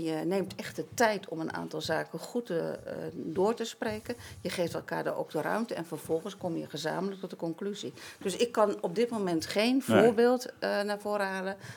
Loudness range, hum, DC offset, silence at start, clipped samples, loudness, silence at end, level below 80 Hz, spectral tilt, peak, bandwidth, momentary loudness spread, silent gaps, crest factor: 7 LU; none; under 0.1%; 0 s; under 0.1%; -31 LUFS; 0 s; -72 dBFS; -5 dB/octave; -8 dBFS; 19.5 kHz; 11 LU; none; 24 dB